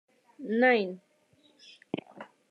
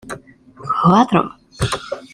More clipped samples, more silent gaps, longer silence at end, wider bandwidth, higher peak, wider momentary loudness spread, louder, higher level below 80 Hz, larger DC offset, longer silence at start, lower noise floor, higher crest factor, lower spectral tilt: neither; neither; first, 0.25 s vs 0.1 s; second, 6.8 kHz vs 12.5 kHz; second, -12 dBFS vs -2 dBFS; first, 25 LU vs 21 LU; second, -28 LUFS vs -17 LUFS; second, -86 dBFS vs -42 dBFS; neither; first, 0.4 s vs 0.05 s; first, -66 dBFS vs -41 dBFS; about the same, 20 dB vs 18 dB; about the same, -6.5 dB/octave vs -6 dB/octave